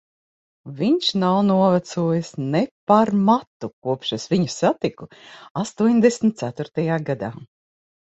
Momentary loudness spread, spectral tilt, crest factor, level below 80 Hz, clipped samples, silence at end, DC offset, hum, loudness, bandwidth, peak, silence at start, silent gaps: 13 LU; -6 dB/octave; 18 dB; -62 dBFS; under 0.1%; 0.7 s; under 0.1%; none; -21 LUFS; 8.2 kHz; -4 dBFS; 0.65 s; 2.71-2.87 s, 3.47-3.60 s, 3.73-3.82 s, 5.51-5.55 s